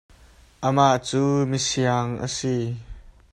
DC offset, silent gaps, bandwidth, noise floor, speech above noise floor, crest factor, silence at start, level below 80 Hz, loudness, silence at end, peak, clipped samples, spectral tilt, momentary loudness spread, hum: under 0.1%; none; 11.5 kHz; -52 dBFS; 30 dB; 20 dB; 0.6 s; -50 dBFS; -23 LUFS; 0.25 s; -4 dBFS; under 0.1%; -5 dB/octave; 9 LU; none